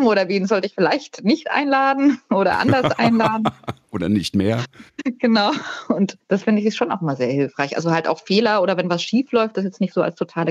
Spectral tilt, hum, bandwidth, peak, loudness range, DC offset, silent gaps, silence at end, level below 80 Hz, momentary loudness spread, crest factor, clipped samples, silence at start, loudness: -6 dB/octave; none; 12 kHz; -4 dBFS; 3 LU; under 0.1%; none; 0 s; -60 dBFS; 7 LU; 16 dB; under 0.1%; 0 s; -19 LUFS